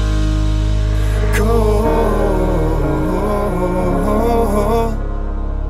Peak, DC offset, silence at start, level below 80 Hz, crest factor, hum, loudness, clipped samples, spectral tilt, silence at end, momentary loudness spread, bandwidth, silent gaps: -2 dBFS; under 0.1%; 0 s; -18 dBFS; 12 dB; none; -17 LUFS; under 0.1%; -7 dB/octave; 0 s; 3 LU; 15 kHz; none